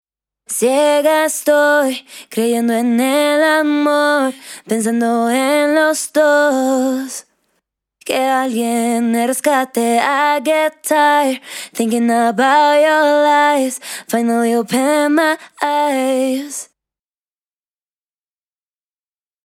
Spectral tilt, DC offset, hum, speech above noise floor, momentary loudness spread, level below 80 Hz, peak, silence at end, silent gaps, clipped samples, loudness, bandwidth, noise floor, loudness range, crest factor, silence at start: -3 dB/octave; under 0.1%; none; over 76 dB; 9 LU; -72 dBFS; -2 dBFS; 2.8 s; none; under 0.1%; -15 LUFS; 17 kHz; under -90 dBFS; 4 LU; 14 dB; 0.5 s